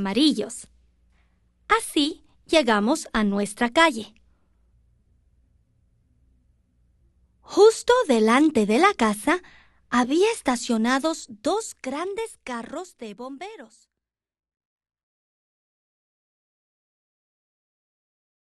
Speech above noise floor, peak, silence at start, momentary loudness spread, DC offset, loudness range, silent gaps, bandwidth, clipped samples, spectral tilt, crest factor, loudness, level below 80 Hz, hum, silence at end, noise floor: 65 dB; -2 dBFS; 0 s; 18 LU; under 0.1%; 15 LU; none; 12.5 kHz; under 0.1%; -4 dB/octave; 22 dB; -22 LUFS; -56 dBFS; none; 4.9 s; -87 dBFS